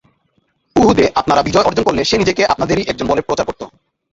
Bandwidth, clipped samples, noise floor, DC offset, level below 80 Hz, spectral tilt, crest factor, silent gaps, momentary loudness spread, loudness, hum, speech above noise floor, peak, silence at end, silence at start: 8 kHz; under 0.1%; -62 dBFS; under 0.1%; -38 dBFS; -5 dB/octave; 16 dB; none; 8 LU; -14 LUFS; none; 48 dB; 0 dBFS; 0.45 s; 0.75 s